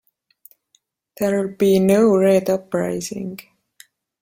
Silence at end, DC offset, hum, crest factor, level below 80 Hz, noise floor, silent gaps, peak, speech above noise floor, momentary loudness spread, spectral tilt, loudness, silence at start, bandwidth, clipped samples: 0.8 s; under 0.1%; none; 16 dB; -58 dBFS; -64 dBFS; none; -4 dBFS; 47 dB; 15 LU; -6.5 dB/octave; -18 LUFS; 1.2 s; 16.5 kHz; under 0.1%